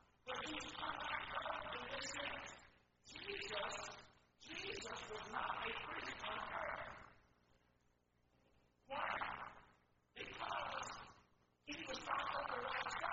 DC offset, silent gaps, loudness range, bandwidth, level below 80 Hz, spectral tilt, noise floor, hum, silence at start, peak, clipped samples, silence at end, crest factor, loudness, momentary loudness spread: under 0.1%; none; 4 LU; 7.6 kHz; -70 dBFS; -0.5 dB/octave; -79 dBFS; 60 Hz at -70 dBFS; 0.25 s; -28 dBFS; under 0.1%; 0 s; 20 dB; -46 LUFS; 13 LU